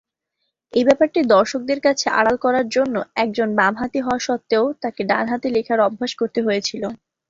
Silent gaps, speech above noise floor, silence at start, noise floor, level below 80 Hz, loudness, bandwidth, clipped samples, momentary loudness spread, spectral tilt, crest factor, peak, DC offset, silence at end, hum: none; 57 dB; 0.75 s; -75 dBFS; -58 dBFS; -19 LUFS; 7.8 kHz; under 0.1%; 7 LU; -4 dB/octave; 18 dB; -2 dBFS; under 0.1%; 0.35 s; none